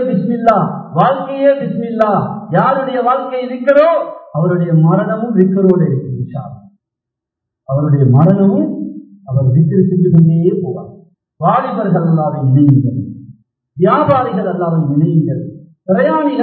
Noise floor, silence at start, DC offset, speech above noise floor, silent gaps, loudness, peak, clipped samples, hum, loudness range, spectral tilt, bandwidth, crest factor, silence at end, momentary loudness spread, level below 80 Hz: -81 dBFS; 0 s; under 0.1%; 69 dB; none; -13 LUFS; 0 dBFS; 0.1%; none; 3 LU; -11.5 dB/octave; 4.5 kHz; 12 dB; 0 s; 12 LU; -50 dBFS